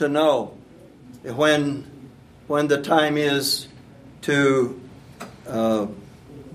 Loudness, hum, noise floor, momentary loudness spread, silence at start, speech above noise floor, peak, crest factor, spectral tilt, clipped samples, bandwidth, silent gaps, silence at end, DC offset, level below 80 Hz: -21 LUFS; none; -46 dBFS; 22 LU; 0 s; 26 dB; -2 dBFS; 20 dB; -4.5 dB/octave; under 0.1%; 15.5 kHz; none; 0 s; under 0.1%; -58 dBFS